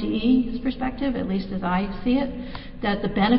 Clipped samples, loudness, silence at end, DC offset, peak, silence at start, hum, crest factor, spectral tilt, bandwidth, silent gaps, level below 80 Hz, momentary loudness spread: under 0.1%; -25 LUFS; 0 s; under 0.1%; -6 dBFS; 0 s; none; 16 dB; -11 dB/octave; 5.6 kHz; none; -38 dBFS; 8 LU